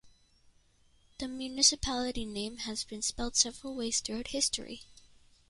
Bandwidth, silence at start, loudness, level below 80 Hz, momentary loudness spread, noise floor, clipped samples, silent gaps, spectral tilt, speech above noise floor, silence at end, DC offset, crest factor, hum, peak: 11.5 kHz; 0.05 s; -31 LUFS; -54 dBFS; 14 LU; -66 dBFS; under 0.1%; none; -1 dB/octave; 32 dB; 0.45 s; under 0.1%; 24 dB; none; -10 dBFS